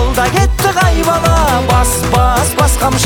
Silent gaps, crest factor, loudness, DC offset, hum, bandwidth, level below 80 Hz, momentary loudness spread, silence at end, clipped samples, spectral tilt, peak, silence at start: none; 10 dB; -11 LUFS; under 0.1%; none; over 20 kHz; -16 dBFS; 1 LU; 0 s; under 0.1%; -4.5 dB/octave; 0 dBFS; 0 s